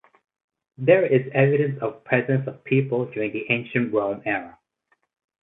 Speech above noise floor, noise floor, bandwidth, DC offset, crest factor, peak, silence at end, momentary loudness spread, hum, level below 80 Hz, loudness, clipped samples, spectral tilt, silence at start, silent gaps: 48 dB; -70 dBFS; 4 kHz; under 0.1%; 20 dB; -4 dBFS; 0.9 s; 9 LU; none; -66 dBFS; -22 LUFS; under 0.1%; -11 dB/octave; 0.8 s; none